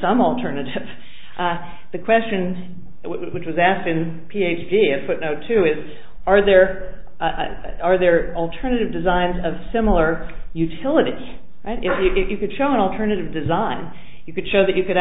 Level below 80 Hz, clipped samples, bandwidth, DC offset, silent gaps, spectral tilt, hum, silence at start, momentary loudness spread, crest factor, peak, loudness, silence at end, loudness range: -36 dBFS; under 0.1%; 4 kHz; 5%; none; -11 dB/octave; none; 0 s; 14 LU; 20 dB; 0 dBFS; -20 LUFS; 0 s; 4 LU